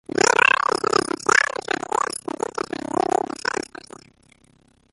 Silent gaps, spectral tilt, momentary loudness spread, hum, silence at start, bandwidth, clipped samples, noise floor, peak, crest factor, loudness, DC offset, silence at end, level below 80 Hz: none; -2 dB/octave; 13 LU; none; 0.15 s; 12 kHz; under 0.1%; -58 dBFS; -2 dBFS; 22 dB; -21 LUFS; under 0.1%; 2.3 s; -60 dBFS